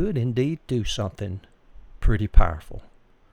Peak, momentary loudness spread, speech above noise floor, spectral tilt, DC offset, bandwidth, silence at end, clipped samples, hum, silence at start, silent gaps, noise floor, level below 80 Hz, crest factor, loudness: -2 dBFS; 16 LU; 25 dB; -6.5 dB/octave; under 0.1%; 9.8 kHz; 0.5 s; under 0.1%; none; 0 s; none; -45 dBFS; -26 dBFS; 20 dB; -26 LUFS